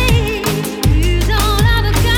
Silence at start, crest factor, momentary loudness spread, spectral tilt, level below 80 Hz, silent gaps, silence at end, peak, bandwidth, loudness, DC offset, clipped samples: 0 s; 12 dB; 4 LU; -5 dB/octave; -16 dBFS; none; 0 s; 0 dBFS; 19 kHz; -15 LUFS; under 0.1%; under 0.1%